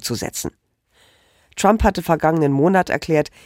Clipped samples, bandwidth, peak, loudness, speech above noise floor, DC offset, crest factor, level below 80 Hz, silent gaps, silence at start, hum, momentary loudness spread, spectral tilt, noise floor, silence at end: under 0.1%; 16.5 kHz; -2 dBFS; -18 LUFS; 40 dB; under 0.1%; 18 dB; -36 dBFS; none; 0 s; none; 12 LU; -5.5 dB/octave; -58 dBFS; 0.2 s